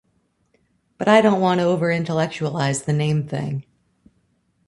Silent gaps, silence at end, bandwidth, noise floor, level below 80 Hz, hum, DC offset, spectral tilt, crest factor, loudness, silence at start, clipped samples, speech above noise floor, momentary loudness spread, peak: none; 1.05 s; 11.5 kHz; -66 dBFS; -60 dBFS; none; under 0.1%; -6 dB/octave; 20 dB; -20 LUFS; 1 s; under 0.1%; 47 dB; 11 LU; -2 dBFS